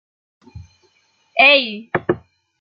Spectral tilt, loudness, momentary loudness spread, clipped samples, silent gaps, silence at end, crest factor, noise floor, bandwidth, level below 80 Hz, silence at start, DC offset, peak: -6 dB/octave; -15 LUFS; 14 LU; under 0.1%; none; 0.45 s; 20 dB; -61 dBFS; 6.6 kHz; -58 dBFS; 0.55 s; under 0.1%; 0 dBFS